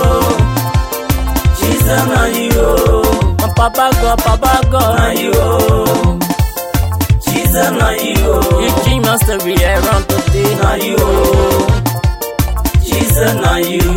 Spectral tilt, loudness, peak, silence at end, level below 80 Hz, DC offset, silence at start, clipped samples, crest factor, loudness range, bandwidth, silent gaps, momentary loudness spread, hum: -5 dB/octave; -12 LUFS; 0 dBFS; 0 s; -18 dBFS; under 0.1%; 0 s; under 0.1%; 12 dB; 1 LU; 17 kHz; none; 4 LU; none